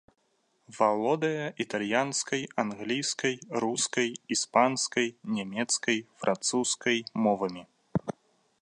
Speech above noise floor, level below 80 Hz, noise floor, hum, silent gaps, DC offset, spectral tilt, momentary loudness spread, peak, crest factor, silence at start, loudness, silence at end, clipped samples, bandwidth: 43 dB; -70 dBFS; -72 dBFS; none; none; under 0.1%; -3 dB/octave; 8 LU; -8 dBFS; 22 dB; 0.7 s; -29 LUFS; 0.5 s; under 0.1%; 11.5 kHz